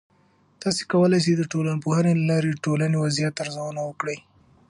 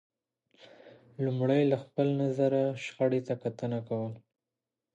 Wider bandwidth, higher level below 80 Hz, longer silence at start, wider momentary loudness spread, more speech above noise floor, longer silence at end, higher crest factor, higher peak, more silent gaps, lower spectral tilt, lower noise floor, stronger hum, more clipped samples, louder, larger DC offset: first, 11 kHz vs 8.4 kHz; first, -64 dBFS vs -78 dBFS; second, 0.6 s vs 0.85 s; about the same, 11 LU vs 9 LU; second, 38 dB vs 60 dB; second, 0.5 s vs 0.75 s; about the same, 16 dB vs 18 dB; first, -8 dBFS vs -14 dBFS; neither; second, -6 dB/octave vs -8 dB/octave; second, -61 dBFS vs -89 dBFS; neither; neither; first, -23 LUFS vs -30 LUFS; neither